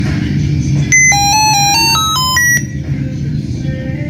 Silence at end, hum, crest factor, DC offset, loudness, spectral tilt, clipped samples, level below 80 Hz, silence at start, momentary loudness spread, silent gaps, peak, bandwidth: 0 s; none; 12 dB; under 0.1%; -11 LUFS; -2.5 dB/octave; under 0.1%; -30 dBFS; 0 s; 12 LU; none; 0 dBFS; 16 kHz